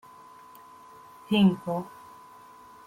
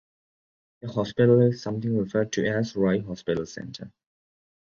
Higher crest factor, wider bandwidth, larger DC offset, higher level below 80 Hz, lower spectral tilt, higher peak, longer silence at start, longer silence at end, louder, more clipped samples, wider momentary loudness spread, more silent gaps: about the same, 20 dB vs 20 dB; first, 15.5 kHz vs 7.2 kHz; neither; second, -68 dBFS vs -58 dBFS; about the same, -7.5 dB/octave vs -7 dB/octave; second, -10 dBFS vs -6 dBFS; first, 1.3 s vs 0.85 s; about the same, 1 s vs 0.9 s; about the same, -25 LUFS vs -25 LUFS; neither; first, 27 LU vs 18 LU; neither